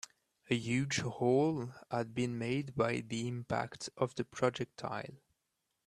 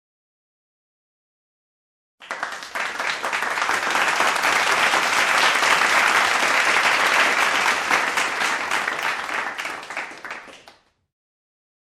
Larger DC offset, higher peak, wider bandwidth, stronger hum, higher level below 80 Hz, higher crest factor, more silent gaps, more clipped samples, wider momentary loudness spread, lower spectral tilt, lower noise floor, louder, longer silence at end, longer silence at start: neither; second, -16 dBFS vs -4 dBFS; second, 12.5 kHz vs 15.5 kHz; neither; about the same, -68 dBFS vs -64 dBFS; about the same, 20 dB vs 18 dB; neither; neither; second, 10 LU vs 13 LU; first, -5.5 dB/octave vs 0 dB/octave; first, -84 dBFS vs -53 dBFS; second, -36 LUFS vs -19 LUFS; second, 0.7 s vs 1.25 s; second, 0.5 s vs 2.2 s